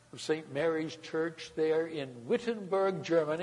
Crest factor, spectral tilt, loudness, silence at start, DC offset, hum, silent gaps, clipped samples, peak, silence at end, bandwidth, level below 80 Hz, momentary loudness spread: 16 dB; -5.5 dB/octave; -33 LUFS; 0.15 s; under 0.1%; none; none; under 0.1%; -16 dBFS; 0 s; 11 kHz; -74 dBFS; 6 LU